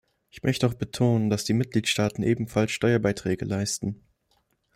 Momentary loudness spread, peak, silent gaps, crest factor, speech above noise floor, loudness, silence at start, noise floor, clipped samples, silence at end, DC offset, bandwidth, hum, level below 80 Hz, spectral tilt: 6 LU; -10 dBFS; none; 16 dB; 45 dB; -26 LUFS; 0.35 s; -70 dBFS; under 0.1%; 0.8 s; under 0.1%; 16 kHz; none; -56 dBFS; -5.5 dB/octave